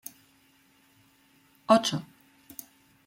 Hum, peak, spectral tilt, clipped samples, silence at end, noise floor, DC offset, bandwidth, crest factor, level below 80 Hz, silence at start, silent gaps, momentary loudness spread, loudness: none; -6 dBFS; -4.5 dB/octave; under 0.1%; 1 s; -63 dBFS; under 0.1%; 16.5 kHz; 26 dB; -72 dBFS; 1.7 s; none; 22 LU; -25 LUFS